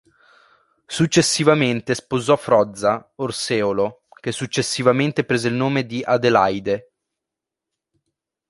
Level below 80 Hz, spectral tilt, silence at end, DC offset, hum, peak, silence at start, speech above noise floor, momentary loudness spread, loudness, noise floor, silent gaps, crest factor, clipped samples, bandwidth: -56 dBFS; -4.5 dB/octave; 1.7 s; under 0.1%; none; -2 dBFS; 0.9 s; 66 dB; 10 LU; -19 LUFS; -85 dBFS; none; 20 dB; under 0.1%; 11.5 kHz